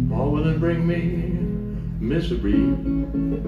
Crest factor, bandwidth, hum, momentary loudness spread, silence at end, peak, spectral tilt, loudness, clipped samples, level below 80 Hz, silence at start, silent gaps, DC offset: 12 dB; 5.6 kHz; none; 6 LU; 0 s; -10 dBFS; -9.5 dB/octave; -23 LUFS; under 0.1%; -30 dBFS; 0 s; none; under 0.1%